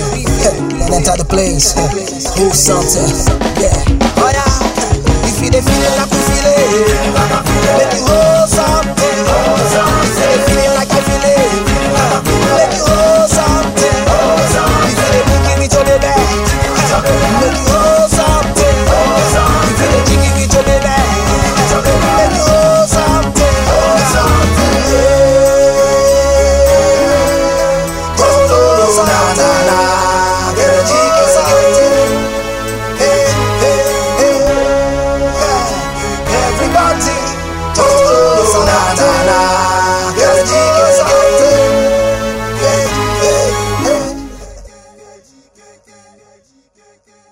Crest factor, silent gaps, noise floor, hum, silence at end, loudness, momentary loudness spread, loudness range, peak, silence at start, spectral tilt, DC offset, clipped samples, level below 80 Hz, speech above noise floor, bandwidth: 10 dB; none; -51 dBFS; none; 2.65 s; -10 LUFS; 5 LU; 3 LU; 0 dBFS; 0 s; -4 dB/octave; under 0.1%; under 0.1%; -20 dBFS; 41 dB; 16.5 kHz